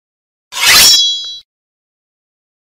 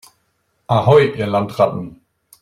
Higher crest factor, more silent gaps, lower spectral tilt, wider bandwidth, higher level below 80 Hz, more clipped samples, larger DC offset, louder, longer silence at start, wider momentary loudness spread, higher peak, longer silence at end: about the same, 14 dB vs 16 dB; neither; second, 2 dB/octave vs -7.5 dB/octave; first, over 20 kHz vs 14 kHz; first, -44 dBFS vs -52 dBFS; first, 0.2% vs under 0.1%; neither; first, -6 LUFS vs -16 LUFS; second, 0.5 s vs 0.7 s; first, 21 LU vs 13 LU; about the same, 0 dBFS vs -2 dBFS; first, 1.35 s vs 0.5 s